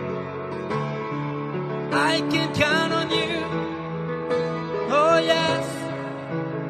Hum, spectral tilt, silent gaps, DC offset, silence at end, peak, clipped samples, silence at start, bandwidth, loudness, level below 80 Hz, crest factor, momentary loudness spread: none; -5 dB/octave; none; under 0.1%; 0 s; -6 dBFS; under 0.1%; 0 s; 13 kHz; -24 LUFS; -56 dBFS; 18 dB; 11 LU